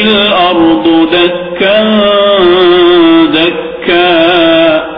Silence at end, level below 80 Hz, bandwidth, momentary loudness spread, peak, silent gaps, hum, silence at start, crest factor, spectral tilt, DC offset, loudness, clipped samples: 0 s; -40 dBFS; 5.2 kHz; 5 LU; 0 dBFS; none; none; 0 s; 6 dB; -7.5 dB/octave; under 0.1%; -6 LUFS; 0.3%